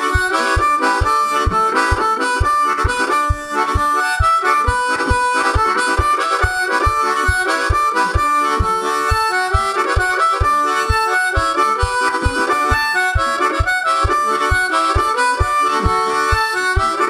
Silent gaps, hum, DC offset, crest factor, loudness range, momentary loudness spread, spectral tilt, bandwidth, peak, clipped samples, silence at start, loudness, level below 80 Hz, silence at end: none; none; under 0.1%; 14 dB; 0 LU; 2 LU; -4 dB/octave; 15.5 kHz; -2 dBFS; under 0.1%; 0 s; -15 LUFS; -26 dBFS; 0 s